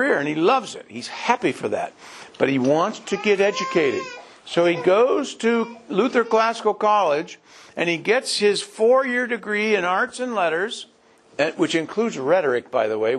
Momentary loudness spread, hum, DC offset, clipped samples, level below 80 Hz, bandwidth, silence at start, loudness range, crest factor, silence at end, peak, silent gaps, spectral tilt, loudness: 11 LU; none; under 0.1%; under 0.1%; -70 dBFS; 12 kHz; 0 s; 2 LU; 20 dB; 0 s; -2 dBFS; none; -4 dB/octave; -21 LUFS